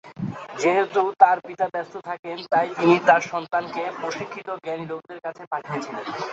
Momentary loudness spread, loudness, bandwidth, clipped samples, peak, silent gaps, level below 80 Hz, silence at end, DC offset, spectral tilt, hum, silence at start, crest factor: 15 LU; -23 LUFS; 8 kHz; under 0.1%; -2 dBFS; 2.19-2.23 s, 5.47-5.51 s; -68 dBFS; 0 s; under 0.1%; -5.5 dB/octave; none; 0.05 s; 22 dB